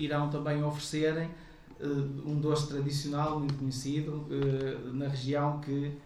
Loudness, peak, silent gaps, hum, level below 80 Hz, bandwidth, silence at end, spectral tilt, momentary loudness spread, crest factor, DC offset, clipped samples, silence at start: -33 LUFS; -18 dBFS; none; none; -56 dBFS; 13 kHz; 0 s; -6.5 dB/octave; 5 LU; 14 dB; under 0.1%; under 0.1%; 0 s